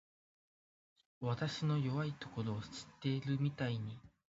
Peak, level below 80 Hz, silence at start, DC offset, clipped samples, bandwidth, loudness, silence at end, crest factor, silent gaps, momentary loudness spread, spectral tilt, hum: -24 dBFS; -70 dBFS; 1.2 s; under 0.1%; under 0.1%; 7.6 kHz; -40 LUFS; 0.25 s; 16 dB; none; 8 LU; -6 dB/octave; none